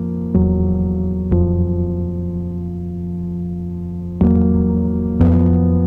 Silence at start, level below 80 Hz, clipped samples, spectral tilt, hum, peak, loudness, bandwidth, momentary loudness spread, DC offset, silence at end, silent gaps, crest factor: 0 s; -26 dBFS; under 0.1%; -12.5 dB/octave; none; 0 dBFS; -18 LUFS; 2.5 kHz; 11 LU; under 0.1%; 0 s; none; 16 dB